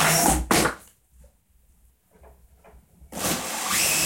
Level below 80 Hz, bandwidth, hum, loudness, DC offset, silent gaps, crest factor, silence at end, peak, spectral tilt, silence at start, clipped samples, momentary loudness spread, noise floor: -40 dBFS; 16.5 kHz; none; -22 LUFS; under 0.1%; none; 20 dB; 0 s; -6 dBFS; -2 dB/octave; 0 s; under 0.1%; 14 LU; -61 dBFS